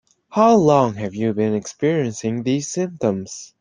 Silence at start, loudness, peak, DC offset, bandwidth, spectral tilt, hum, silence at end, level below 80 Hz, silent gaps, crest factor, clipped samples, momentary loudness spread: 0.3 s; -19 LUFS; -2 dBFS; under 0.1%; 10 kHz; -6 dB/octave; none; 0.15 s; -58 dBFS; none; 18 dB; under 0.1%; 11 LU